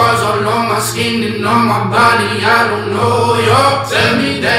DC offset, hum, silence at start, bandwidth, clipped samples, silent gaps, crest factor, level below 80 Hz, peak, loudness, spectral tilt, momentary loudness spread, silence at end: under 0.1%; none; 0 s; 16 kHz; under 0.1%; none; 12 dB; -46 dBFS; 0 dBFS; -12 LUFS; -4.5 dB/octave; 5 LU; 0 s